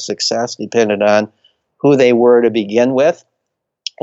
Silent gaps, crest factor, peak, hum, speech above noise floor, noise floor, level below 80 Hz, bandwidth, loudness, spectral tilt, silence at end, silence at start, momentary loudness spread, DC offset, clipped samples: none; 14 dB; 0 dBFS; none; 63 dB; -75 dBFS; -62 dBFS; 8 kHz; -13 LUFS; -4.5 dB/octave; 0.9 s; 0 s; 16 LU; under 0.1%; under 0.1%